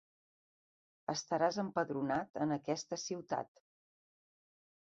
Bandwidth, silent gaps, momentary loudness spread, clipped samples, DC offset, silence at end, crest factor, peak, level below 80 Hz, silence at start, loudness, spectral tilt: 7.6 kHz; 2.30-2.34 s; 7 LU; under 0.1%; under 0.1%; 1.4 s; 20 dB; -20 dBFS; -78 dBFS; 1.1 s; -38 LUFS; -4.5 dB/octave